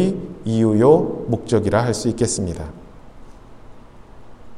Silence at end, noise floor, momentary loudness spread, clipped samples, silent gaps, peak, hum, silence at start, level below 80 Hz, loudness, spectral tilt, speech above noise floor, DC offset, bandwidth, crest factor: 0 s; -40 dBFS; 13 LU; under 0.1%; none; -2 dBFS; none; 0 s; -44 dBFS; -19 LUFS; -6 dB/octave; 23 dB; under 0.1%; 12.5 kHz; 20 dB